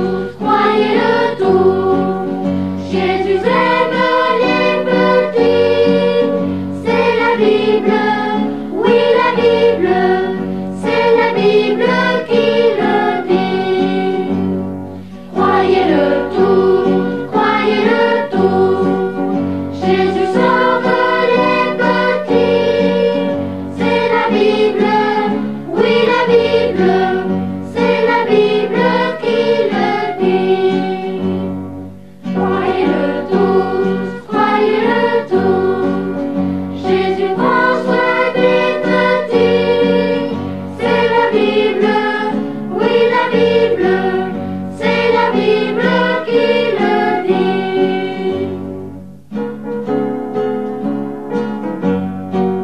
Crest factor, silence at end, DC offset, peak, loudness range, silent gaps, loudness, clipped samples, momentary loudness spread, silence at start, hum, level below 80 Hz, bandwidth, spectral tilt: 14 dB; 0 s; 0.9%; 0 dBFS; 4 LU; none; -14 LUFS; under 0.1%; 8 LU; 0 s; none; -54 dBFS; 10 kHz; -7 dB/octave